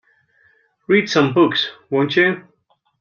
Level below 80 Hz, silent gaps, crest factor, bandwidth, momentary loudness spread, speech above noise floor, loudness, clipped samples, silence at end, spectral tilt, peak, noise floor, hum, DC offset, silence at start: -64 dBFS; none; 16 dB; 7.2 kHz; 7 LU; 47 dB; -17 LUFS; under 0.1%; 0.6 s; -5.5 dB/octave; -2 dBFS; -64 dBFS; none; under 0.1%; 0.9 s